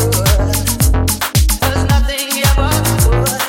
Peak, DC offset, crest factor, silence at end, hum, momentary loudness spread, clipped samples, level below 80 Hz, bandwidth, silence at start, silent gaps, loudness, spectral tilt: 0 dBFS; under 0.1%; 12 dB; 0 s; none; 2 LU; under 0.1%; -16 dBFS; 17 kHz; 0 s; none; -14 LUFS; -4 dB/octave